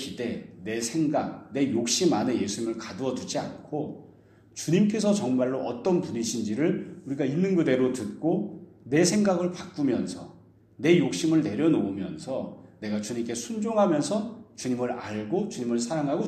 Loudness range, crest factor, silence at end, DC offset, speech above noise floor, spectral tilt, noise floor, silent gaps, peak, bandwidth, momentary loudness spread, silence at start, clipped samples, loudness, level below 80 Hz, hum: 3 LU; 20 dB; 0 s; under 0.1%; 28 dB; -5 dB/octave; -54 dBFS; none; -8 dBFS; 14 kHz; 11 LU; 0 s; under 0.1%; -27 LUFS; -66 dBFS; none